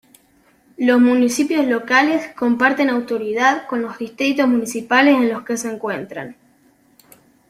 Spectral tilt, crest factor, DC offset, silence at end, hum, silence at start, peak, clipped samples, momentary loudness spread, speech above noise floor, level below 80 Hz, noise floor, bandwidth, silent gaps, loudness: -3.5 dB/octave; 16 dB; under 0.1%; 1.15 s; none; 0.8 s; -2 dBFS; under 0.1%; 12 LU; 39 dB; -64 dBFS; -56 dBFS; 15 kHz; none; -17 LUFS